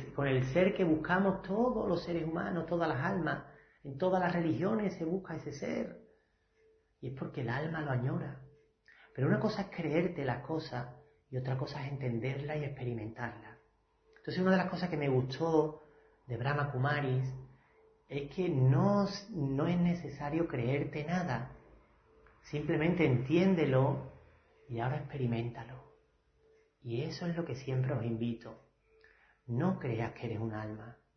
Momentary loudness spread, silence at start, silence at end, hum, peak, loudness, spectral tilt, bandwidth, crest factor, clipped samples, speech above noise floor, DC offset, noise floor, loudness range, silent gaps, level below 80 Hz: 14 LU; 0 s; 0.25 s; none; -16 dBFS; -34 LUFS; -8 dB/octave; 6.4 kHz; 20 dB; under 0.1%; 39 dB; under 0.1%; -72 dBFS; 7 LU; none; -62 dBFS